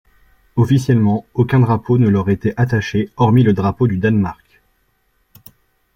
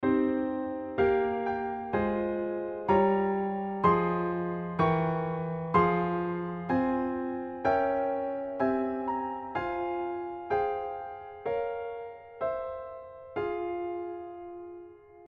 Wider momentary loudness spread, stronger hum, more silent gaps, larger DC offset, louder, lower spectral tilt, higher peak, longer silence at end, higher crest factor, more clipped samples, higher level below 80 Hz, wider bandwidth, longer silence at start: second, 6 LU vs 14 LU; neither; neither; neither; first, -16 LUFS vs -30 LUFS; about the same, -8.5 dB/octave vs -9.5 dB/octave; first, -2 dBFS vs -12 dBFS; first, 1.6 s vs 0.05 s; about the same, 14 dB vs 18 dB; neither; first, -46 dBFS vs -58 dBFS; first, 16.5 kHz vs 6.2 kHz; first, 0.55 s vs 0 s